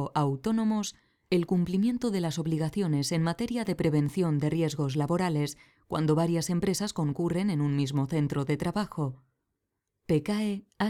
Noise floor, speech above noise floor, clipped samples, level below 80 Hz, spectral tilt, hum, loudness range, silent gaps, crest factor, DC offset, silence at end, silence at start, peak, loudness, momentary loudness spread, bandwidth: -83 dBFS; 55 dB; under 0.1%; -58 dBFS; -6.5 dB/octave; none; 2 LU; none; 16 dB; under 0.1%; 0 s; 0 s; -14 dBFS; -29 LUFS; 5 LU; 15.5 kHz